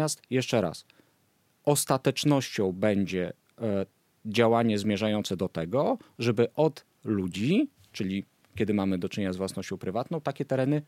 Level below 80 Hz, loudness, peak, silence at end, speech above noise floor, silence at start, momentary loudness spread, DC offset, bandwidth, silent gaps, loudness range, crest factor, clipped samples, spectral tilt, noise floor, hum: -66 dBFS; -28 LUFS; -10 dBFS; 0.05 s; 41 dB; 0 s; 9 LU; under 0.1%; 16.5 kHz; none; 3 LU; 20 dB; under 0.1%; -5.5 dB/octave; -69 dBFS; none